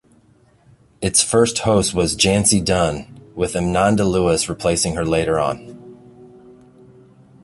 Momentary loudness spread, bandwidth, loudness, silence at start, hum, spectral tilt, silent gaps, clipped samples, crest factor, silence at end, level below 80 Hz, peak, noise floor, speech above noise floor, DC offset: 10 LU; 12 kHz; -17 LUFS; 1 s; none; -4 dB/octave; none; under 0.1%; 18 dB; 1.2 s; -40 dBFS; 0 dBFS; -54 dBFS; 37 dB; under 0.1%